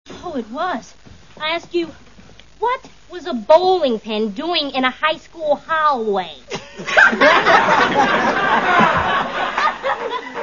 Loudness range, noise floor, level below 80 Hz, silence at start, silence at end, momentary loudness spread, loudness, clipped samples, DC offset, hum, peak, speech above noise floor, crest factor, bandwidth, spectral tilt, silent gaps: 7 LU; -45 dBFS; -50 dBFS; 0.1 s; 0 s; 15 LU; -17 LUFS; under 0.1%; 0.5%; none; 0 dBFS; 28 dB; 18 dB; 7.4 kHz; -4 dB/octave; none